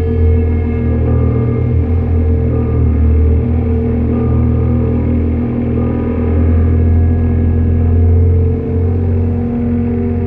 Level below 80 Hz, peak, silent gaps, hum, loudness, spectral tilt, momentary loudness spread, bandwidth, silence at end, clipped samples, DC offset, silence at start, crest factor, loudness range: -18 dBFS; -2 dBFS; none; none; -13 LUFS; -13 dB/octave; 4 LU; 2.9 kHz; 0 s; under 0.1%; under 0.1%; 0 s; 10 dB; 1 LU